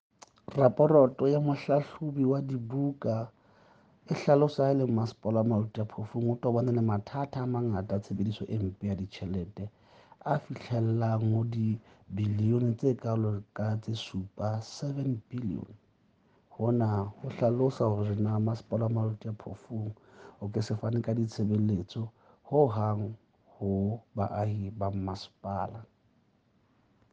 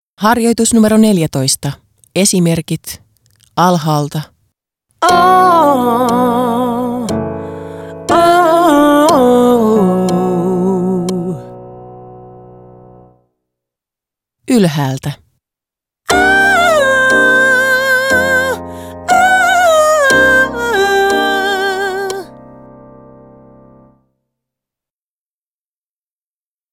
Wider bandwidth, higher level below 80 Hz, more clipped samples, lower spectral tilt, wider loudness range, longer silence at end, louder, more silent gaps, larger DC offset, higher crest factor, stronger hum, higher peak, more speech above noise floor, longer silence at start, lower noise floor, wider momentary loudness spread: second, 7.6 kHz vs 17.5 kHz; second, -66 dBFS vs -44 dBFS; neither; first, -9 dB/octave vs -4.5 dB/octave; second, 6 LU vs 10 LU; second, 1.3 s vs 4.4 s; second, -30 LUFS vs -11 LUFS; neither; neither; first, 22 dB vs 14 dB; neither; second, -8 dBFS vs 0 dBFS; second, 39 dB vs over 79 dB; first, 0.5 s vs 0.2 s; second, -68 dBFS vs under -90 dBFS; about the same, 12 LU vs 14 LU